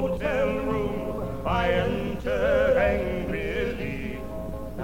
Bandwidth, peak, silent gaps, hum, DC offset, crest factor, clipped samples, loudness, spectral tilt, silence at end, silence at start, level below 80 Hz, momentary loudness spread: 17 kHz; -10 dBFS; none; none; 0.9%; 16 dB; under 0.1%; -26 LUFS; -7 dB/octave; 0 s; 0 s; -38 dBFS; 12 LU